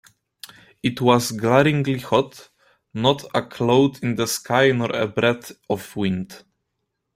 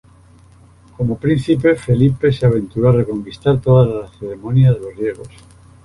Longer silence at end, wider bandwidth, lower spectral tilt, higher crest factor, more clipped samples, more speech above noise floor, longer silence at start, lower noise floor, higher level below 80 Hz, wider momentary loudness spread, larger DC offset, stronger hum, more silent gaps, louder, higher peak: first, 0.8 s vs 0.55 s; first, 16 kHz vs 11 kHz; second, -5 dB/octave vs -9 dB/octave; first, 20 dB vs 14 dB; neither; first, 57 dB vs 31 dB; second, 0.85 s vs 1 s; first, -77 dBFS vs -46 dBFS; second, -58 dBFS vs -40 dBFS; about the same, 13 LU vs 11 LU; neither; neither; neither; second, -21 LUFS vs -16 LUFS; about the same, -2 dBFS vs -2 dBFS